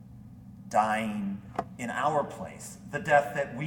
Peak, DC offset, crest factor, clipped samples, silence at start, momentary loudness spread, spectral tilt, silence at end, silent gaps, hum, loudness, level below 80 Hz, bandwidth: -8 dBFS; under 0.1%; 22 dB; under 0.1%; 0 s; 22 LU; -5.5 dB/octave; 0 s; none; none; -29 LUFS; -60 dBFS; 18 kHz